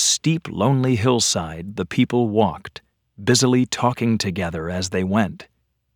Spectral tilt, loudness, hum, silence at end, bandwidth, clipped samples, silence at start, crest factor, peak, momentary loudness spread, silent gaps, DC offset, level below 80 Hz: -4.5 dB/octave; -20 LUFS; none; 0.5 s; over 20 kHz; under 0.1%; 0 s; 18 dB; -2 dBFS; 9 LU; none; under 0.1%; -50 dBFS